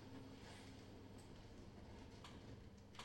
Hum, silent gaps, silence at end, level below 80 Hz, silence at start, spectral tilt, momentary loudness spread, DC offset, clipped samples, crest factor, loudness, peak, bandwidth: none; none; 0 s; -66 dBFS; 0 s; -5 dB/octave; 2 LU; under 0.1%; under 0.1%; 18 dB; -59 LUFS; -40 dBFS; 16 kHz